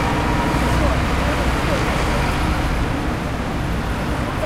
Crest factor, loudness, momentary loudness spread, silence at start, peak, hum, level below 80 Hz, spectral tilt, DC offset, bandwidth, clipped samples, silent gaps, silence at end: 14 dB; -20 LUFS; 4 LU; 0 s; -4 dBFS; none; -24 dBFS; -5.5 dB/octave; under 0.1%; 15.5 kHz; under 0.1%; none; 0 s